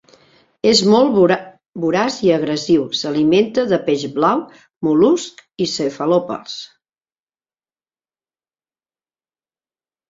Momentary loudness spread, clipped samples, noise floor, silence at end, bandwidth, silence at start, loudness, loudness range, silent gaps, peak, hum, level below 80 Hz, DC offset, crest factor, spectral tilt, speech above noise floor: 11 LU; under 0.1%; under -90 dBFS; 3.45 s; 7.8 kHz; 0.65 s; -16 LUFS; 9 LU; 1.69-1.73 s, 4.76-4.81 s; -2 dBFS; none; -58 dBFS; under 0.1%; 18 dB; -5 dB/octave; over 74 dB